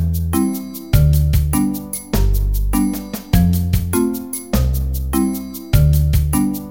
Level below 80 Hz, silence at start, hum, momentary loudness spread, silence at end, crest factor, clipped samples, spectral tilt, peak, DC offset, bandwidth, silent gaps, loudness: -20 dBFS; 0 s; none; 7 LU; 0 s; 16 dB; under 0.1%; -6.5 dB/octave; 0 dBFS; 0.2%; 17 kHz; none; -18 LUFS